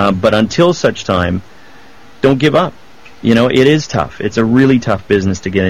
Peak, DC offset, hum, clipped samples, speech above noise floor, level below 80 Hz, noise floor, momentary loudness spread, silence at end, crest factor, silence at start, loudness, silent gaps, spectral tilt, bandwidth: 0 dBFS; 1%; none; under 0.1%; 29 dB; -40 dBFS; -41 dBFS; 8 LU; 0 s; 12 dB; 0 s; -13 LUFS; none; -6 dB/octave; 13 kHz